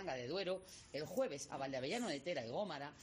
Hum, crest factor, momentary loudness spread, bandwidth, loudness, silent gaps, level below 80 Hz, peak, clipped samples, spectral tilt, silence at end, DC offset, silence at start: none; 16 dB; 5 LU; 15.5 kHz; -43 LUFS; none; -74 dBFS; -28 dBFS; under 0.1%; -4 dB/octave; 0 s; under 0.1%; 0 s